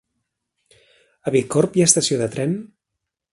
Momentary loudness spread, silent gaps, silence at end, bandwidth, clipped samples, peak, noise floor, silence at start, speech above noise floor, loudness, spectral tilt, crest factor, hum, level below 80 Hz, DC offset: 12 LU; none; 0.65 s; 11.5 kHz; under 0.1%; 0 dBFS; -82 dBFS; 1.25 s; 63 dB; -19 LUFS; -4 dB/octave; 22 dB; none; -60 dBFS; under 0.1%